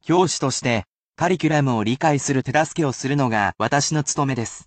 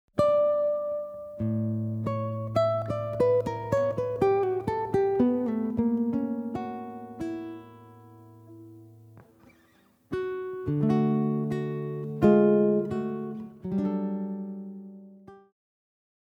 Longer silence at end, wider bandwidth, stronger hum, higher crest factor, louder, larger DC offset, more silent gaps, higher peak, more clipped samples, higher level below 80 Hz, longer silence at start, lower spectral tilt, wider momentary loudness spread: second, 0.05 s vs 1 s; about the same, 9 kHz vs 8.6 kHz; neither; second, 16 dB vs 22 dB; first, -21 LUFS vs -27 LUFS; neither; first, 0.92-1.13 s vs none; about the same, -6 dBFS vs -8 dBFS; neither; about the same, -54 dBFS vs -58 dBFS; about the same, 0.05 s vs 0.15 s; second, -4.5 dB/octave vs -9.5 dB/octave; second, 4 LU vs 15 LU